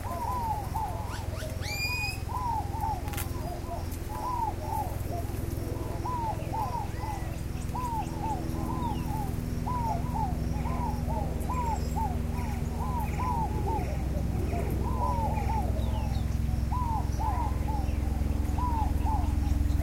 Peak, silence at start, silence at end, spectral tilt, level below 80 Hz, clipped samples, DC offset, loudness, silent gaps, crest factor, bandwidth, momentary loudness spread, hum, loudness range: -14 dBFS; 0 s; 0 s; -6.5 dB/octave; -34 dBFS; under 0.1%; under 0.1%; -32 LUFS; none; 14 dB; 16.5 kHz; 5 LU; none; 3 LU